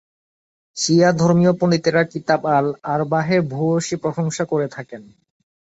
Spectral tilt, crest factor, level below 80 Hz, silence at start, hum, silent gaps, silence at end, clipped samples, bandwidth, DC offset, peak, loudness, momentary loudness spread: -5.5 dB/octave; 16 dB; -58 dBFS; 0.75 s; none; none; 0.75 s; under 0.1%; 8.2 kHz; under 0.1%; -2 dBFS; -19 LUFS; 11 LU